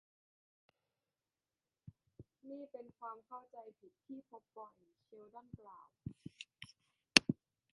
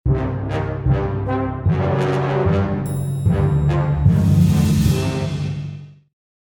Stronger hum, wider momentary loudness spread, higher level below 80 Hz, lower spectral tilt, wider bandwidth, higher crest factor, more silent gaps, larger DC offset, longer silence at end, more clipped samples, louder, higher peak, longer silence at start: neither; first, 29 LU vs 9 LU; second, -76 dBFS vs -30 dBFS; second, -2 dB/octave vs -7.5 dB/octave; second, 11 kHz vs 18 kHz; first, 40 dB vs 16 dB; neither; neither; about the same, 0.4 s vs 0.5 s; neither; second, -33 LUFS vs -19 LUFS; about the same, -4 dBFS vs -2 dBFS; first, 1.85 s vs 0.05 s